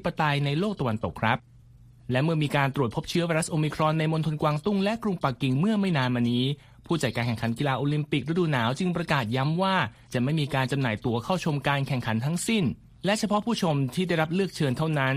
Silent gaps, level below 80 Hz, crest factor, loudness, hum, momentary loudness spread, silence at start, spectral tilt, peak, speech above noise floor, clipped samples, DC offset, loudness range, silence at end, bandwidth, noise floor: none; -54 dBFS; 18 dB; -26 LUFS; none; 4 LU; 0 s; -6 dB/octave; -8 dBFS; 26 dB; under 0.1%; under 0.1%; 1 LU; 0 s; 15.5 kHz; -52 dBFS